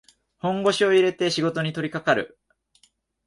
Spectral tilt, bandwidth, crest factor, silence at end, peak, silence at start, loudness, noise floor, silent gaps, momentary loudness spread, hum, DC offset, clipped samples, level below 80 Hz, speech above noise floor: -5 dB/octave; 11.5 kHz; 18 dB; 1 s; -6 dBFS; 0.45 s; -23 LUFS; -64 dBFS; none; 9 LU; none; under 0.1%; under 0.1%; -64 dBFS; 42 dB